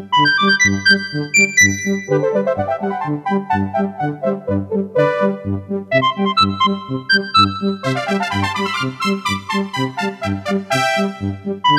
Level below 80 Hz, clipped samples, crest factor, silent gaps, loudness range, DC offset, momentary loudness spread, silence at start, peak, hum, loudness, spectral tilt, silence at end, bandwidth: -56 dBFS; under 0.1%; 14 dB; none; 5 LU; under 0.1%; 9 LU; 0 s; -2 dBFS; none; -17 LUFS; -4 dB/octave; 0 s; 15 kHz